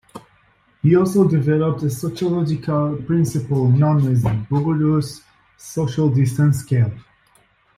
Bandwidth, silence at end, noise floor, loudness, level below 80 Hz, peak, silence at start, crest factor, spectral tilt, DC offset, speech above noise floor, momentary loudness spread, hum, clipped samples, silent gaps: 14.5 kHz; 0.75 s; -57 dBFS; -19 LUFS; -48 dBFS; -4 dBFS; 0.15 s; 14 dB; -8 dB/octave; under 0.1%; 40 dB; 7 LU; none; under 0.1%; none